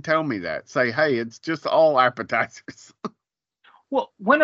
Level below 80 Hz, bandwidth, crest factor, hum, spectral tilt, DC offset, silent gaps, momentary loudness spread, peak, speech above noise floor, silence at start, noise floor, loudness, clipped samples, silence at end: -70 dBFS; 7.6 kHz; 20 dB; none; -3 dB/octave; under 0.1%; none; 19 LU; -2 dBFS; 61 dB; 0.05 s; -83 dBFS; -22 LUFS; under 0.1%; 0 s